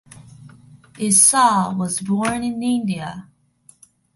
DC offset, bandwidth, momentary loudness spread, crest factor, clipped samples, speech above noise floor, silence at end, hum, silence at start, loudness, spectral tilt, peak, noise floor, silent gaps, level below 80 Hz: under 0.1%; 12 kHz; 16 LU; 20 dB; under 0.1%; 36 dB; 0.95 s; none; 0.4 s; -17 LUFS; -3 dB/octave; 0 dBFS; -54 dBFS; none; -56 dBFS